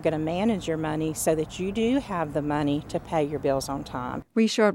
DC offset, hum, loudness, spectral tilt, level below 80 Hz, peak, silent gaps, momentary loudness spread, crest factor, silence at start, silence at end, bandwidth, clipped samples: under 0.1%; none; -27 LUFS; -5.5 dB/octave; -50 dBFS; -10 dBFS; none; 5 LU; 16 dB; 0 s; 0 s; 16.5 kHz; under 0.1%